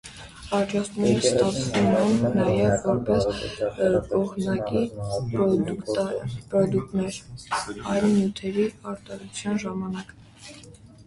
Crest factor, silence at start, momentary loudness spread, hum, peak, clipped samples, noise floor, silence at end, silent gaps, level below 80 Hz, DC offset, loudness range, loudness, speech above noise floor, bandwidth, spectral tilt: 18 dB; 0.05 s; 15 LU; none; -6 dBFS; under 0.1%; -47 dBFS; 0.05 s; none; -48 dBFS; under 0.1%; 5 LU; -25 LUFS; 23 dB; 11.5 kHz; -6 dB/octave